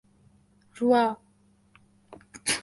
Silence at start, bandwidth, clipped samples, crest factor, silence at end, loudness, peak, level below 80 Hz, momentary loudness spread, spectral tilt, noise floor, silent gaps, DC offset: 0.75 s; 12 kHz; under 0.1%; 20 dB; 0 s; -25 LUFS; -10 dBFS; -68 dBFS; 20 LU; -2.5 dB/octave; -63 dBFS; none; under 0.1%